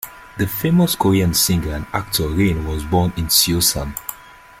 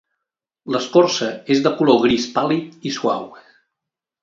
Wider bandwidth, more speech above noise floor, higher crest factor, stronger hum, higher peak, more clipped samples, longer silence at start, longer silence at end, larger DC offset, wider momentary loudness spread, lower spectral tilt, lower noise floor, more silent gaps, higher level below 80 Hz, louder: first, 16.5 kHz vs 7.8 kHz; second, 24 dB vs 66 dB; about the same, 18 dB vs 20 dB; neither; about the same, -2 dBFS vs 0 dBFS; neither; second, 0 s vs 0.65 s; second, 0.3 s vs 0.85 s; neither; about the same, 10 LU vs 11 LU; about the same, -4 dB/octave vs -5 dB/octave; second, -42 dBFS vs -84 dBFS; neither; first, -34 dBFS vs -56 dBFS; about the same, -17 LUFS vs -18 LUFS